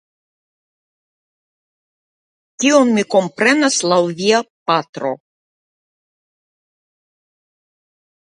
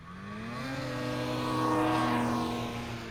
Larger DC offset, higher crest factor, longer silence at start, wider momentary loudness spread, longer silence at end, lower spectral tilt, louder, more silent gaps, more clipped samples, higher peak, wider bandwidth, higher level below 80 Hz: neither; first, 20 dB vs 14 dB; first, 2.6 s vs 0 s; about the same, 11 LU vs 11 LU; first, 3.1 s vs 0 s; second, -3.5 dB/octave vs -5.5 dB/octave; first, -15 LUFS vs -32 LUFS; first, 4.50-4.66 s, 4.89-4.93 s vs none; neither; first, 0 dBFS vs -18 dBFS; second, 10.5 kHz vs 18.5 kHz; second, -70 dBFS vs -54 dBFS